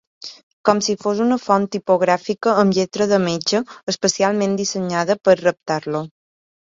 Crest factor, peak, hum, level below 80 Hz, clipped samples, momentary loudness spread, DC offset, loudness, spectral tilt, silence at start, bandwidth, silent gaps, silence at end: 18 dB; 0 dBFS; none; -60 dBFS; under 0.1%; 9 LU; under 0.1%; -19 LUFS; -4.5 dB/octave; 0.25 s; 7.8 kHz; 0.43-0.64 s, 3.83-3.87 s; 0.65 s